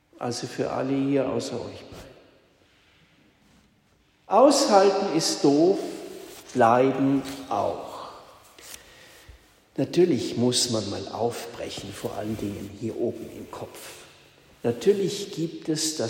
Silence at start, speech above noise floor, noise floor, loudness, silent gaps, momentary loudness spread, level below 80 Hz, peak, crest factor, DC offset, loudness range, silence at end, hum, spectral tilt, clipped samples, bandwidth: 0.2 s; 39 dB; -63 dBFS; -24 LUFS; none; 21 LU; -62 dBFS; -4 dBFS; 22 dB; under 0.1%; 11 LU; 0 s; none; -4.5 dB/octave; under 0.1%; 16 kHz